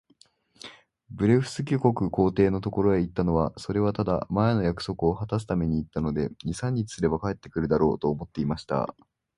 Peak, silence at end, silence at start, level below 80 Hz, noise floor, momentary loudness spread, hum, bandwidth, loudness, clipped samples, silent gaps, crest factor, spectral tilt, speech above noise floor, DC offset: -6 dBFS; 0.45 s; 0.65 s; -46 dBFS; -62 dBFS; 8 LU; none; 11.5 kHz; -26 LUFS; under 0.1%; none; 20 dB; -7.5 dB/octave; 36 dB; under 0.1%